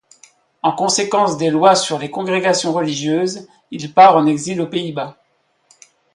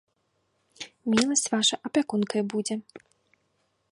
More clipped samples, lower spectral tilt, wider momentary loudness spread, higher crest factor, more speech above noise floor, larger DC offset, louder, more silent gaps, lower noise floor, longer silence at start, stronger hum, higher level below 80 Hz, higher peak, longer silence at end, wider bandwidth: neither; about the same, -4 dB/octave vs -3 dB/octave; first, 16 LU vs 13 LU; second, 16 dB vs 24 dB; about the same, 47 dB vs 47 dB; neither; first, -16 LUFS vs -26 LUFS; neither; second, -62 dBFS vs -73 dBFS; second, 0.65 s vs 0.8 s; neither; first, -64 dBFS vs -70 dBFS; first, 0 dBFS vs -4 dBFS; about the same, 1.05 s vs 0.95 s; about the same, 11.5 kHz vs 11.5 kHz